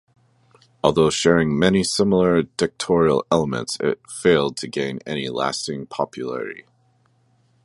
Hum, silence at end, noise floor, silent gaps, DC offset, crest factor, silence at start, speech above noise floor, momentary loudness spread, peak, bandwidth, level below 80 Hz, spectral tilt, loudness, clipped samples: none; 1.05 s; -61 dBFS; none; under 0.1%; 20 dB; 0.85 s; 41 dB; 10 LU; -2 dBFS; 11.5 kHz; -50 dBFS; -5 dB/octave; -20 LUFS; under 0.1%